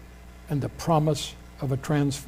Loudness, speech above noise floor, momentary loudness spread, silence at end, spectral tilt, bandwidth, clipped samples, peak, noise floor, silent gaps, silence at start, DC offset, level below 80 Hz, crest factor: -27 LUFS; 20 dB; 12 LU; 0 s; -6 dB/octave; 16 kHz; under 0.1%; -10 dBFS; -45 dBFS; none; 0 s; under 0.1%; -46 dBFS; 16 dB